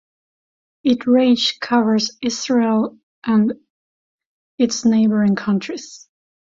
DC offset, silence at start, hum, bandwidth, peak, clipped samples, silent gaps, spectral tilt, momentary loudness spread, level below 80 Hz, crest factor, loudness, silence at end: under 0.1%; 0.85 s; none; 7.6 kHz; -4 dBFS; under 0.1%; 3.03-3.22 s, 3.70-4.18 s, 4.26-4.58 s; -5 dB/octave; 13 LU; -62 dBFS; 14 dB; -18 LUFS; 0.5 s